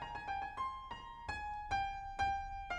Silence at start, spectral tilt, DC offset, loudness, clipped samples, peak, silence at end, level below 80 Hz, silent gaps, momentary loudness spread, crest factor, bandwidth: 0 s; -3.5 dB/octave; under 0.1%; -41 LUFS; under 0.1%; -26 dBFS; 0 s; -54 dBFS; none; 9 LU; 16 dB; 11 kHz